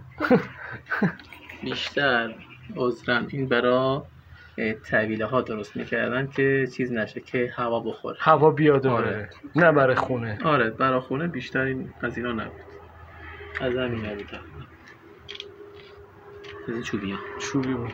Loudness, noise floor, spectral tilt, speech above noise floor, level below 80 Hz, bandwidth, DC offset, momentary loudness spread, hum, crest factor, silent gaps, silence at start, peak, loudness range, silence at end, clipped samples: -25 LUFS; -48 dBFS; -6.5 dB/octave; 24 dB; -56 dBFS; 16 kHz; under 0.1%; 20 LU; none; 22 dB; none; 0 s; -4 dBFS; 12 LU; 0 s; under 0.1%